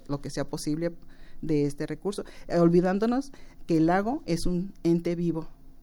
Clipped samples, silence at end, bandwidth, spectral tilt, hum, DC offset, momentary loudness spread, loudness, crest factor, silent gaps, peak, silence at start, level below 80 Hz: under 0.1%; 0 s; 16.5 kHz; -7 dB/octave; none; under 0.1%; 11 LU; -27 LUFS; 16 dB; none; -10 dBFS; 0 s; -42 dBFS